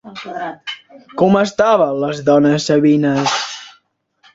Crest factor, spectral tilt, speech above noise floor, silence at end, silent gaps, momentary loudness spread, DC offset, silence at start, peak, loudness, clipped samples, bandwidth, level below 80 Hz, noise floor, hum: 16 dB; -5.5 dB/octave; 44 dB; 0.65 s; none; 16 LU; under 0.1%; 0.05 s; 0 dBFS; -15 LUFS; under 0.1%; 7.8 kHz; -56 dBFS; -58 dBFS; none